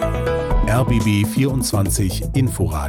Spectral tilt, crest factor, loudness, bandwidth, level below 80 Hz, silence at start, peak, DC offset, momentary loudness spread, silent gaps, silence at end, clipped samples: -5.5 dB/octave; 10 dB; -19 LUFS; 18 kHz; -26 dBFS; 0 s; -8 dBFS; under 0.1%; 3 LU; none; 0 s; under 0.1%